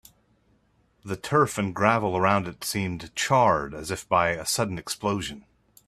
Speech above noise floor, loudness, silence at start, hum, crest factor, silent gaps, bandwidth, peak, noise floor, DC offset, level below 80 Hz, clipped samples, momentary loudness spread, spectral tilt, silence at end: 40 dB; -25 LUFS; 1.05 s; none; 22 dB; none; 15.5 kHz; -4 dBFS; -65 dBFS; under 0.1%; -56 dBFS; under 0.1%; 11 LU; -4.5 dB/octave; 0.5 s